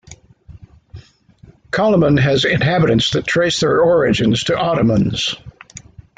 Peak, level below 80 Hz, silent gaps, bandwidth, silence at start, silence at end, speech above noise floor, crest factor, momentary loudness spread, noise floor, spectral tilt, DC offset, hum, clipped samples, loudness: -4 dBFS; -42 dBFS; none; 9.4 kHz; 0.1 s; 0.4 s; 32 dB; 14 dB; 7 LU; -46 dBFS; -5.5 dB/octave; under 0.1%; none; under 0.1%; -15 LUFS